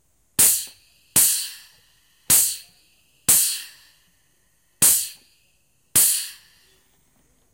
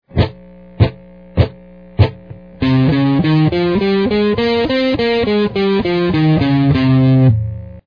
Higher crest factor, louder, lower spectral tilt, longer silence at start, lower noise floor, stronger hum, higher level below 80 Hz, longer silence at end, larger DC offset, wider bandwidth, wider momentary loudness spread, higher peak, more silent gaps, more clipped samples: first, 22 dB vs 14 dB; second, -17 LUFS vs -14 LUFS; second, 0.5 dB/octave vs -9.5 dB/octave; first, 0.4 s vs 0.15 s; first, -65 dBFS vs -38 dBFS; neither; second, -58 dBFS vs -32 dBFS; first, 1.2 s vs 0.1 s; second, under 0.1% vs 0.3%; first, 16.5 kHz vs 5.2 kHz; first, 16 LU vs 7 LU; about the same, -2 dBFS vs 0 dBFS; neither; neither